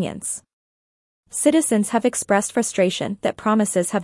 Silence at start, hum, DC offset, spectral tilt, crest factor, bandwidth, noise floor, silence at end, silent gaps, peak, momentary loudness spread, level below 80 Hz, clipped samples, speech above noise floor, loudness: 0 s; none; under 0.1%; -4 dB/octave; 16 dB; 12 kHz; under -90 dBFS; 0 s; 0.53-1.23 s; -4 dBFS; 10 LU; -62 dBFS; under 0.1%; over 70 dB; -20 LUFS